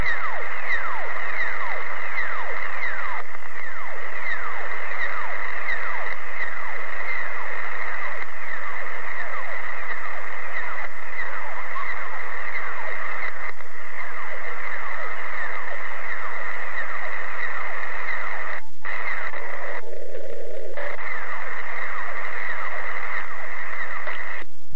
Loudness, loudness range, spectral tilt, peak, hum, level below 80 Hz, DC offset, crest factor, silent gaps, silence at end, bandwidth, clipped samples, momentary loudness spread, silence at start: -29 LUFS; 3 LU; -4.5 dB/octave; -8 dBFS; none; -52 dBFS; 20%; 16 dB; none; 0 s; 8.8 kHz; under 0.1%; 6 LU; 0 s